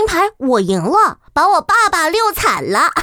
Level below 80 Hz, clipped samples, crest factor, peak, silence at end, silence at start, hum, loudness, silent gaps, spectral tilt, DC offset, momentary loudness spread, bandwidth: -40 dBFS; under 0.1%; 12 dB; -2 dBFS; 0 s; 0 s; none; -14 LUFS; none; -3.5 dB/octave; under 0.1%; 4 LU; over 20 kHz